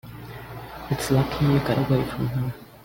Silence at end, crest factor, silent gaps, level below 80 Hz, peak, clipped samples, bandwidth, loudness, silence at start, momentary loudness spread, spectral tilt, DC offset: 0 s; 16 dB; none; -44 dBFS; -10 dBFS; under 0.1%; 17 kHz; -24 LUFS; 0.05 s; 17 LU; -6.5 dB/octave; under 0.1%